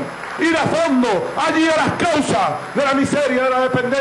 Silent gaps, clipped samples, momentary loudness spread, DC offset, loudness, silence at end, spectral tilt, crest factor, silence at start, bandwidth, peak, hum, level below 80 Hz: none; under 0.1%; 3 LU; under 0.1%; -17 LUFS; 0 s; -4.5 dB/octave; 12 dB; 0 s; 12.5 kHz; -6 dBFS; none; -52 dBFS